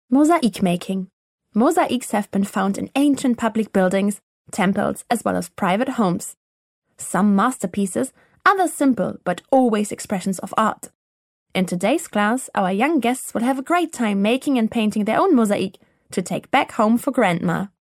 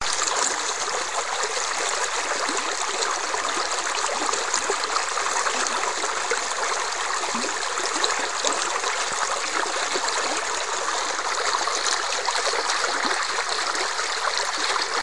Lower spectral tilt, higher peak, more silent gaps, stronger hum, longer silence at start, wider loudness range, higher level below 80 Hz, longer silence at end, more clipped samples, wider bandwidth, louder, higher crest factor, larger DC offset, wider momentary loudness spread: first, -5.5 dB/octave vs 1 dB/octave; second, -4 dBFS vs 0 dBFS; first, 1.13-1.38 s, 4.23-4.45 s, 6.37-6.82 s, 10.95-11.46 s vs none; neither; about the same, 0.1 s vs 0 s; about the same, 2 LU vs 1 LU; about the same, -62 dBFS vs -62 dBFS; first, 0.2 s vs 0 s; neither; first, 15.5 kHz vs 11.5 kHz; first, -20 LUFS vs -23 LUFS; second, 18 dB vs 24 dB; second, under 0.1% vs 1%; first, 9 LU vs 2 LU